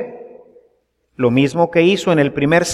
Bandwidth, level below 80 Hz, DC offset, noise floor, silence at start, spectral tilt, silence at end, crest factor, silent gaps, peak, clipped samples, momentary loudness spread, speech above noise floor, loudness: 13 kHz; -52 dBFS; under 0.1%; -63 dBFS; 0 s; -5.5 dB/octave; 0 s; 16 dB; none; -2 dBFS; under 0.1%; 5 LU; 49 dB; -15 LUFS